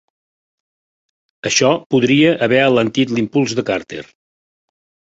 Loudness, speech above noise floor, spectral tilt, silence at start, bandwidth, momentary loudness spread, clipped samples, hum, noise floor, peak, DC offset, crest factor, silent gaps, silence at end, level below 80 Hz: -15 LUFS; over 75 dB; -4.5 dB/octave; 1.45 s; 8 kHz; 11 LU; under 0.1%; none; under -90 dBFS; -2 dBFS; under 0.1%; 16 dB; 1.86-1.90 s; 1.1 s; -56 dBFS